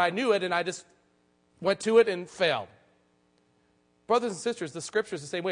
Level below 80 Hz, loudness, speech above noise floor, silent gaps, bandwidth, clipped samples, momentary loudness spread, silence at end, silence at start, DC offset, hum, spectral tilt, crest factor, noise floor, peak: -74 dBFS; -28 LUFS; 41 dB; none; 10.5 kHz; under 0.1%; 12 LU; 0 s; 0 s; under 0.1%; none; -4 dB/octave; 18 dB; -68 dBFS; -10 dBFS